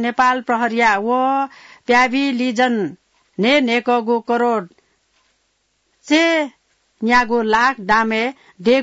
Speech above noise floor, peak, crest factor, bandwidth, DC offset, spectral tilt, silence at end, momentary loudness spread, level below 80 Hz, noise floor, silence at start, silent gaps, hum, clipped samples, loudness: 49 dB; -4 dBFS; 14 dB; 8 kHz; under 0.1%; -4 dB/octave; 0 s; 9 LU; -54 dBFS; -66 dBFS; 0 s; none; none; under 0.1%; -17 LUFS